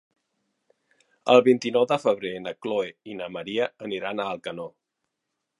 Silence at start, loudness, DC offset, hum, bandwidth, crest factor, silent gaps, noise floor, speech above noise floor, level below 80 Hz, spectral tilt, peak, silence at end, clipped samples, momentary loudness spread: 1.25 s; -25 LUFS; under 0.1%; none; 11 kHz; 22 dB; none; -82 dBFS; 57 dB; -72 dBFS; -5 dB/octave; -4 dBFS; 0.9 s; under 0.1%; 17 LU